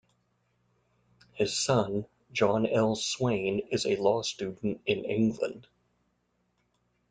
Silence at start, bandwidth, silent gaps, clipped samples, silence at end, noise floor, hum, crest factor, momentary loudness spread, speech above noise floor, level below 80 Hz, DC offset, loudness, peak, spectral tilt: 1.35 s; 9.6 kHz; none; under 0.1%; 1.5 s; -75 dBFS; 60 Hz at -55 dBFS; 20 dB; 8 LU; 46 dB; -64 dBFS; under 0.1%; -29 LUFS; -10 dBFS; -4.5 dB/octave